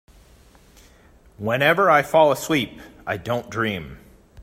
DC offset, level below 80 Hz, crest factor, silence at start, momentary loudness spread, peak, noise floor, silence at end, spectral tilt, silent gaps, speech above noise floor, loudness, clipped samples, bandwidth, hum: under 0.1%; -52 dBFS; 20 dB; 1.4 s; 16 LU; -2 dBFS; -52 dBFS; 0 s; -5 dB/octave; none; 32 dB; -20 LUFS; under 0.1%; 16 kHz; none